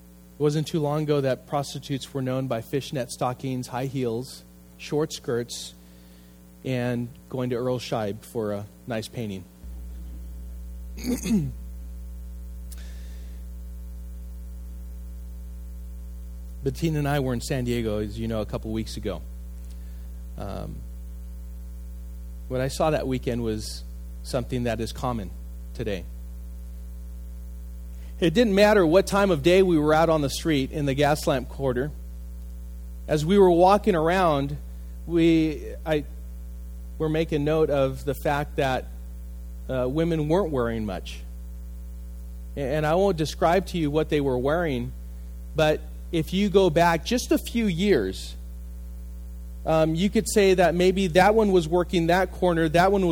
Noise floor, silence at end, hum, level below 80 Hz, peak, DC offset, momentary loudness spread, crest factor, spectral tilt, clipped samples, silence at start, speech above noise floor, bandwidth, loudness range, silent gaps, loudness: -49 dBFS; 0 s; 60 Hz at -35 dBFS; -38 dBFS; -4 dBFS; under 0.1%; 20 LU; 22 dB; -6 dB/octave; under 0.1%; 0 s; 25 dB; 19.5 kHz; 13 LU; none; -24 LUFS